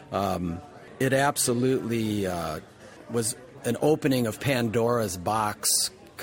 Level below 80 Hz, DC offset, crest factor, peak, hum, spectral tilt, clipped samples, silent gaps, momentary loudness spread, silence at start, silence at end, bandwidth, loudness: -56 dBFS; under 0.1%; 16 dB; -10 dBFS; none; -4 dB/octave; under 0.1%; none; 10 LU; 0 s; 0 s; 16.5 kHz; -26 LUFS